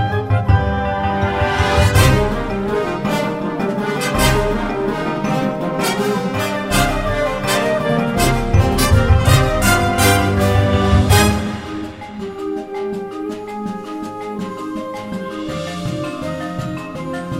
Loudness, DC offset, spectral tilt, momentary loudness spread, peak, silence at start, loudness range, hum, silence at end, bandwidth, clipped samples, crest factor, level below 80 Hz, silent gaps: -17 LUFS; under 0.1%; -5 dB/octave; 13 LU; 0 dBFS; 0 s; 11 LU; none; 0 s; 16.5 kHz; under 0.1%; 16 dB; -26 dBFS; none